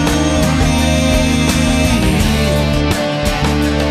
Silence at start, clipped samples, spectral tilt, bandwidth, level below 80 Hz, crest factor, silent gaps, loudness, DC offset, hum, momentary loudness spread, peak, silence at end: 0 s; under 0.1%; -5 dB/octave; 14 kHz; -20 dBFS; 12 dB; none; -14 LUFS; under 0.1%; none; 2 LU; 0 dBFS; 0 s